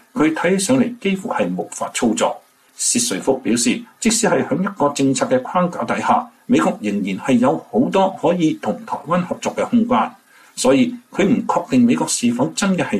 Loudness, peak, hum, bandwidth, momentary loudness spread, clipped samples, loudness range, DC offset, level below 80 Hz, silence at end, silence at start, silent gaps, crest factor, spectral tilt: -18 LUFS; -4 dBFS; none; 14 kHz; 6 LU; under 0.1%; 1 LU; under 0.1%; -54 dBFS; 0 s; 0.15 s; none; 14 dB; -4.5 dB/octave